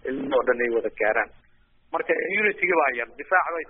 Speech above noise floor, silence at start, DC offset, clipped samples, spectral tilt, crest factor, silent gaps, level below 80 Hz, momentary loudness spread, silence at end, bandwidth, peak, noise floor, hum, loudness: 34 dB; 0.05 s; under 0.1%; under 0.1%; 2.5 dB/octave; 18 dB; none; -58 dBFS; 9 LU; 0.05 s; 3.8 kHz; -6 dBFS; -58 dBFS; none; -24 LUFS